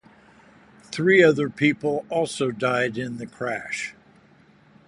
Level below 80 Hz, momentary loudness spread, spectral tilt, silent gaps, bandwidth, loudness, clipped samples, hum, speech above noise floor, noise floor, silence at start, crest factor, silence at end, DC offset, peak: -64 dBFS; 15 LU; -5.5 dB/octave; none; 11.5 kHz; -22 LUFS; under 0.1%; none; 33 dB; -55 dBFS; 0.9 s; 20 dB; 0.95 s; under 0.1%; -4 dBFS